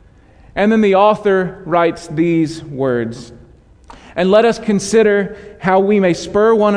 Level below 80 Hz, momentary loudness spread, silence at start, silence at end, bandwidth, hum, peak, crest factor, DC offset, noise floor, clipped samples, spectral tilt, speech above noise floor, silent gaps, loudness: -46 dBFS; 10 LU; 0.55 s; 0 s; 11 kHz; none; 0 dBFS; 14 dB; under 0.1%; -44 dBFS; under 0.1%; -6 dB/octave; 31 dB; none; -14 LUFS